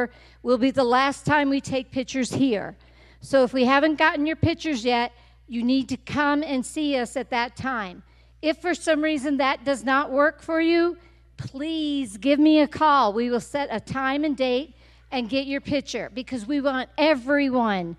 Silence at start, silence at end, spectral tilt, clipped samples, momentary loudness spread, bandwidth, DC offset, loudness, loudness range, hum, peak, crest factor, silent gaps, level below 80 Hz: 0 s; 0.05 s; -5 dB/octave; under 0.1%; 11 LU; 12 kHz; under 0.1%; -23 LUFS; 4 LU; none; -4 dBFS; 18 dB; none; -52 dBFS